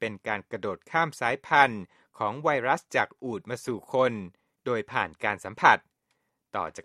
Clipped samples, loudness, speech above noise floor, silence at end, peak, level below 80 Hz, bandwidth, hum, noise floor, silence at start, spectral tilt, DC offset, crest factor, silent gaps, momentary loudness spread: under 0.1%; -27 LUFS; 49 dB; 0.05 s; -2 dBFS; -68 dBFS; 13.5 kHz; none; -77 dBFS; 0 s; -4.5 dB/octave; under 0.1%; 26 dB; none; 13 LU